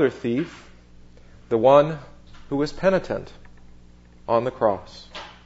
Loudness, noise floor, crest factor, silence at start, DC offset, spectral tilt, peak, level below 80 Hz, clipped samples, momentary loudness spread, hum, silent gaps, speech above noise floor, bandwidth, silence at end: -22 LUFS; -48 dBFS; 22 dB; 0 s; under 0.1%; -7 dB/octave; -2 dBFS; -48 dBFS; under 0.1%; 22 LU; 60 Hz at -50 dBFS; none; 27 dB; 8 kHz; 0.2 s